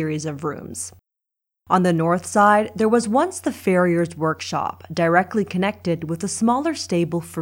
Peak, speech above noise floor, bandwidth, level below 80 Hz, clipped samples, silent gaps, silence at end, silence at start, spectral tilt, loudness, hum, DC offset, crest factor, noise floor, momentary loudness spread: -2 dBFS; 64 dB; 16.5 kHz; -60 dBFS; under 0.1%; none; 0 s; 0 s; -5.5 dB/octave; -21 LUFS; none; under 0.1%; 18 dB; -84 dBFS; 10 LU